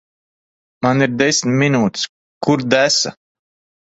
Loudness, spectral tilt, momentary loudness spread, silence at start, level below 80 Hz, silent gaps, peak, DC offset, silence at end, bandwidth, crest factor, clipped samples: -16 LUFS; -4 dB/octave; 10 LU; 0.8 s; -56 dBFS; 2.09-2.41 s; 0 dBFS; under 0.1%; 0.85 s; 8.2 kHz; 18 dB; under 0.1%